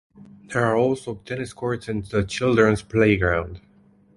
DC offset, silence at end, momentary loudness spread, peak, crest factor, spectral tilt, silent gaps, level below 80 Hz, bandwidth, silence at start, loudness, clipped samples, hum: under 0.1%; 0.6 s; 12 LU; -4 dBFS; 18 dB; -6.5 dB/octave; none; -42 dBFS; 11.5 kHz; 0.2 s; -22 LUFS; under 0.1%; none